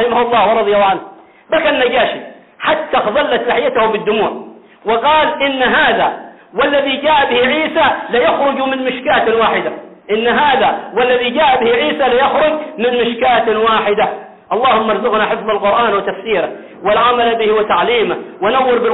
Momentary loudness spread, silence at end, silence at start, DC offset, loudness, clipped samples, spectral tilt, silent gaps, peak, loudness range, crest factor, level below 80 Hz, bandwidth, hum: 7 LU; 0 s; 0 s; under 0.1%; -13 LUFS; under 0.1%; -8 dB/octave; none; -2 dBFS; 2 LU; 10 dB; -48 dBFS; 4.1 kHz; none